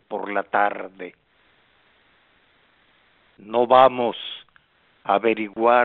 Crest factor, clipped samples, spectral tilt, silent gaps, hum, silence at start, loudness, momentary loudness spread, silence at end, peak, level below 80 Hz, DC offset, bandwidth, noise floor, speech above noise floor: 20 dB; under 0.1%; -2 dB/octave; none; none; 0.1 s; -20 LUFS; 21 LU; 0 s; -2 dBFS; -70 dBFS; under 0.1%; 4.3 kHz; -61 dBFS; 40 dB